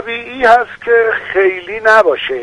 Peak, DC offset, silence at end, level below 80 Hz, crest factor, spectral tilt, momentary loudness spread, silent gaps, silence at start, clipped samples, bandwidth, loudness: 0 dBFS; under 0.1%; 0 s; -48 dBFS; 12 dB; -3.5 dB/octave; 6 LU; none; 0 s; 0.2%; 11 kHz; -12 LUFS